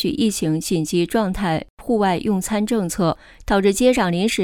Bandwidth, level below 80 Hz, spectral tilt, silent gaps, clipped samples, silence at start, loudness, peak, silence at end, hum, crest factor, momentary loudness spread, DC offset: 18 kHz; -40 dBFS; -5 dB/octave; 1.70-1.77 s; under 0.1%; 0 s; -20 LUFS; -4 dBFS; 0 s; none; 16 dB; 6 LU; under 0.1%